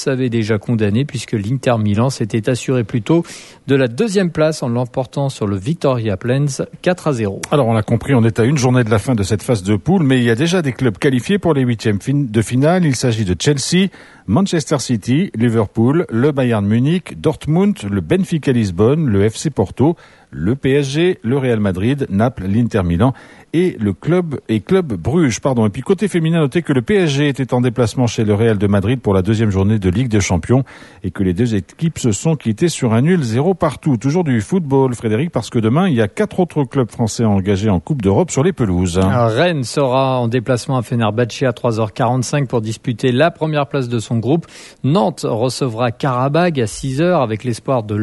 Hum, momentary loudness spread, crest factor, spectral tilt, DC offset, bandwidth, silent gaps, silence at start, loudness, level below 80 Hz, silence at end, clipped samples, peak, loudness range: none; 5 LU; 14 dB; -6.5 dB/octave; under 0.1%; 12 kHz; none; 0 s; -16 LUFS; -44 dBFS; 0 s; under 0.1%; 0 dBFS; 2 LU